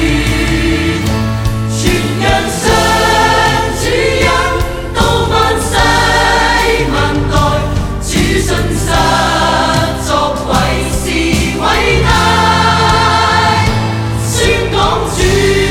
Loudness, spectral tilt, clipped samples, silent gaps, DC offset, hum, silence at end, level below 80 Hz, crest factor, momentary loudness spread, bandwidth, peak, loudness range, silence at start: -11 LUFS; -4.5 dB/octave; under 0.1%; none; under 0.1%; none; 0 s; -20 dBFS; 10 dB; 5 LU; 18 kHz; 0 dBFS; 2 LU; 0 s